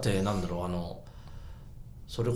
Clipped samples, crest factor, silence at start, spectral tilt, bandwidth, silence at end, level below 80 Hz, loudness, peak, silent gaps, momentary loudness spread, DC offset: under 0.1%; 18 dB; 0 s; -6.5 dB/octave; 16 kHz; 0 s; -46 dBFS; -33 LUFS; -16 dBFS; none; 20 LU; under 0.1%